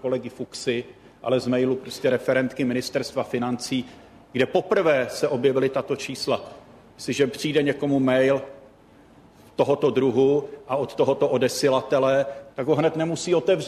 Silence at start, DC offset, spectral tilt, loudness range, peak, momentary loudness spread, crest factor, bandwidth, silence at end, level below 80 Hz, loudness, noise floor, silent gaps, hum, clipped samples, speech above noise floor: 0.05 s; under 0.1%; -5.5 dB/octave; 3 LU; -8 dBFS; 9 LU; 16 dB; 13.5 kHz; 0 s; -62 dBFS; -23 LUFS; -52 dBFS; none; none; under 0.1%; 29 dB